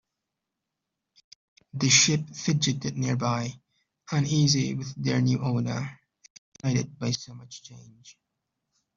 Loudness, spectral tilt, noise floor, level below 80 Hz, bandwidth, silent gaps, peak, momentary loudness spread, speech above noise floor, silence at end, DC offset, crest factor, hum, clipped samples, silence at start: -25 LUFS; -4 dB/octave; -85 dBFS; -62 dBFS; 7.6 kHz; 6.30-6.52 s; -6 dBFS; 18 LU; 59 dB; 0.85 s; under 0.1%; 22 dB; none; under 0.1%; 1.75 s